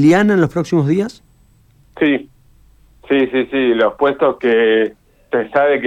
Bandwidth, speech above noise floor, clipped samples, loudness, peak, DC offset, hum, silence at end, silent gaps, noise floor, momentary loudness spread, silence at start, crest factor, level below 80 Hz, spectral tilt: 10.5 kHz; 37 dB; under 0.1%; -15 LUFS; -2 dBFS; under 0.1%; none; 0 s; none; -51 dBFS; 8 LU; 0 s; 12 dB; -52 dBFS; -7 dB/octave